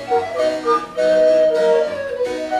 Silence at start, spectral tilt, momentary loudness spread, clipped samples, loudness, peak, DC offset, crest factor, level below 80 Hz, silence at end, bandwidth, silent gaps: 0 s; -4 dB/octave; 9 LU; under 0.1%; -17 LUFS; -6 dBFS; under 0.1%; 12 dB; -54 dBFS; 0 s; 12 kHz; none